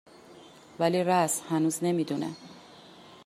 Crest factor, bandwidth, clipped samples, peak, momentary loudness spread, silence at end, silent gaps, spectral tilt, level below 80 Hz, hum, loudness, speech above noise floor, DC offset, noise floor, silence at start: 18 dB; 15.5 kHz; under 0.1%; -12 dBFS; 21 LU; 0.1 s; none; -5 dB/octave; -74 dBFS; none; -28 LUFS; 24 dB; under 0.1%; -52 dBFS; 0.3 s